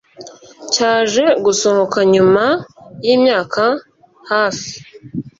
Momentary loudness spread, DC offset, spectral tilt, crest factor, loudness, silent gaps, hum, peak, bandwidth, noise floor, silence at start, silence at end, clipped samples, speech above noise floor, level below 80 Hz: 16 LU; under 0.1%; -3.5 dB/octave; 14 dB; -14 LUFS; none; none; 0 dBFS; 7.8 kHz; -38 dBFS; 0.2 s; 0.1 s; under 0.1%; 24 dB; -56 dBFS